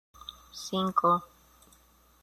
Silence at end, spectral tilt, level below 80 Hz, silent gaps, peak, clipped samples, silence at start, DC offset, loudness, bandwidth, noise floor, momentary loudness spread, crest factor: 1 s; -5.5 dB/octave; -64 dBFS; none; -12 dBFS; under 0.1%; 0.3 s; under 0.1%; -28 LUFS; 14.5 kHz; -61 dBFS; 20 LU; 20 dB